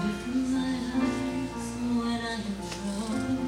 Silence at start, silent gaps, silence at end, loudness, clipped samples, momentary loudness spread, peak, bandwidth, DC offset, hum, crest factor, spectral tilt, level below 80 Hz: 0 s; none; 0 s; -30 LUFS; under 0.1%; 5 LU; -18 dBFS; 14.5 kHz; under 0.1%; none; 12 dB; -5 dB/octave; -48 dBFS